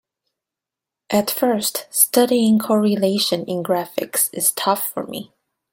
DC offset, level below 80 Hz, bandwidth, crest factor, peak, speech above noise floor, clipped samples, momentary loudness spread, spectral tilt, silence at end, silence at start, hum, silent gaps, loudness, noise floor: under 0.1%; -66 dBFS; 17 kHz; 20 dB; 0 dBFS; 68 dB; under 0.1%; 8 LU; -3.5 dB/octave; 0.5 s; 1.1 s; none; none; -18 LUFS; -86 dBFS